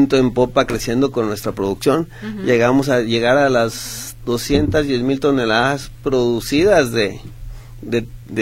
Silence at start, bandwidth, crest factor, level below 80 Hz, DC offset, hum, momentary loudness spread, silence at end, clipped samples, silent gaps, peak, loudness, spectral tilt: 0 s; 16.5 kHz; 16 dB; -36 dBFS; under 0.1%; none; 13 LU; 0 s; under 0.1%; none; 0 dBFS; -17 LUFS; -5 dB/octave